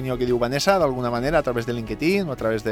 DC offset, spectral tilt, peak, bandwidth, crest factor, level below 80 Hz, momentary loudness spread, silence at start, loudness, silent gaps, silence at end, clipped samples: under 0.1%; -5.5 dB/octave; -6 dBFS; 17 kHz; 16 dB; -42 dBFS; 6 LU; 0 s; -22 LUFS; none; 0 s; under 0.1%